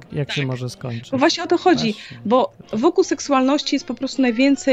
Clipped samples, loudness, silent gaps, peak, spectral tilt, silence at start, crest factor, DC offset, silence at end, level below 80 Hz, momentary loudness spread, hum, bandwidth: under 0.1%; -19 LUFS; none; -2 dBFS; -5 dB/octave; 0.1 s; 16 dB; under 0.1%; 0 s; -56 dBFS; 9 LU; none; 9.4 kHz